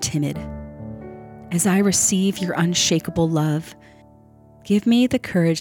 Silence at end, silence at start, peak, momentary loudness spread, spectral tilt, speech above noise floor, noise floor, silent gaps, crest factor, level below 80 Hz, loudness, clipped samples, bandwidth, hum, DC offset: 0 s; 0 s; -6 dBFS; 19 LU; -4.5 dB/octave; 30 dB; -49 dBFS; none; 14 dB; -48 dBFS; -20 LUFS; under 0.1%; 18.5 kHz; none; under 0.1%